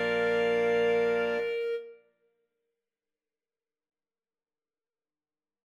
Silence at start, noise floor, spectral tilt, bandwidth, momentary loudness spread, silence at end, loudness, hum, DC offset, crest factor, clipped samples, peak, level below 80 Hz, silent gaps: 0 s; under -90 dBFS; -5 dB/octave; 8.2 kHz; 8 LU; 3.75 s; -28 LUFS; none; under 0.1%; 14 dB; under 0.1%; -18 dBFS; -68 dBFS; none